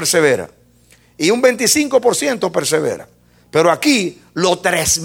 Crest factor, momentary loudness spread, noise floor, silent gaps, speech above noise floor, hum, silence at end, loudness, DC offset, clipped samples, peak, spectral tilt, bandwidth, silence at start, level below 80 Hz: 16 dB; 8 LU; -50 dBFS; none; 35 dB; none; 0 s; -15 LUFS; under 0.1%; under 0.1%; 0 dBFS; -3 dB/octave; 17 kHz; 0 s; -50 dBFS